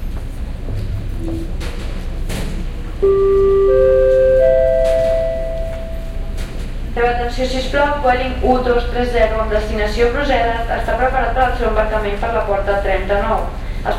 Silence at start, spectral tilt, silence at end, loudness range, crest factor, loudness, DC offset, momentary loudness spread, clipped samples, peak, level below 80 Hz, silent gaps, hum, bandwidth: 0 s; -6 dB/octave; 0 s; 6 LU; 14 dB; -17 LUFS; under 0.1%; 15 LU; under 0.1%; -2 dBFS; -22 dBFS; none; none; 13 kHz